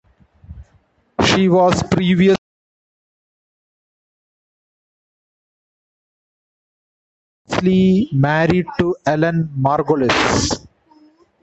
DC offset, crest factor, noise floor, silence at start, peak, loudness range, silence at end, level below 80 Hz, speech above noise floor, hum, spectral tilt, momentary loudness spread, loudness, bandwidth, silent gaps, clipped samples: under 0.1%; 18 dB; -58 dBFS; 0.5 s; -2 dBFS; 7 LU; 0.85 s; -42 dBFS; 43 dB; none; -5.5 dB/octave; 7 LU; -16 LUFS; 8.2 kHz; 2.38-7.45 s; under 0.1%